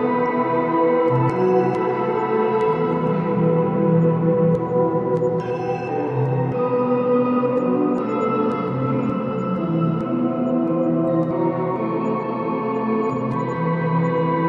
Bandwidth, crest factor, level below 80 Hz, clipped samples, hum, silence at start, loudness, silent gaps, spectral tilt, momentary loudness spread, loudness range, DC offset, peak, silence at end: 6.8 kHz; 14 dB; -58 dBFS; under 0.1%; none; 0 s; -20 LUFS; none; -10 dB/octave; 5 LU; 2 LU; under 0.1%; -6 dBFS; 0 s